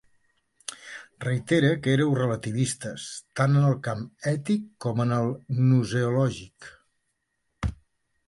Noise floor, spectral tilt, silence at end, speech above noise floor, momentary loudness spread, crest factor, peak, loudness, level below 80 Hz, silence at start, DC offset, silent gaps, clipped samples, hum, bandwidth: -77 dBFS; -6.5 dB/octave; 0.55 s; 52 dB; 16 LU; 18 dB; -8 dBFS; -26 LUFS; -48 dBFS; 0.7 s; under 0.1%; none; under 0.1%; none; 11.5 kHz